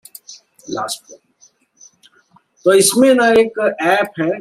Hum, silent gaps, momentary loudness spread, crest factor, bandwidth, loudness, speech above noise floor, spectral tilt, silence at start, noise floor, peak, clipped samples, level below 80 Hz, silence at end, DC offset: none; none; 17 LU; 16 dB; 15.5 kHz; -14 LUFS; 40 dB; -3 dB/octave; 0.3 s; -54 dBFS; 0 dBFS; under 0.1%; -60 dBFS; 0 s; under 0.1%